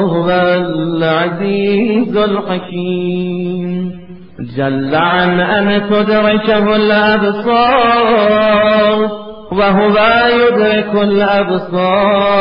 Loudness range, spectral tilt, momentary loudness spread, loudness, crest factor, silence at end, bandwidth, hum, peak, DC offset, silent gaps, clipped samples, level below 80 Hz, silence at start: 6 LU; -9 dB/octave; 9 LU; -12 LUFS; 12 dB; 0 s; 5.4 kHz; none; 0 dBFS; 1%; none; under 0.1%; -42 dBFS; 0 s